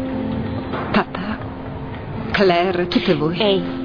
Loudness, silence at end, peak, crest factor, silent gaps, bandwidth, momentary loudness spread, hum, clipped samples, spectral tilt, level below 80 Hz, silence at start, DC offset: -20 LUFS; 0 s; -4 dBFS; 16 dB; none; 5.4 kHz; 14 LU; none; under 0.1%; -7.5 dB/octave; -40 dBFS; 0 s; under 0.1%